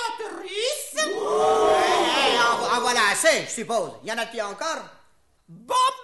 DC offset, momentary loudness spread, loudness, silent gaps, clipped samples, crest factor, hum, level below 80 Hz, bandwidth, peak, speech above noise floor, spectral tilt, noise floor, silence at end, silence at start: 0.2%; 11 LU; -22 LUFS; none; under 0.1%; 16 dB; none; -60 dBFS; 12 kHz; -6 dBFS; 37 dB; -1 dB/octave; -61 dBFS; 0 s; 0 s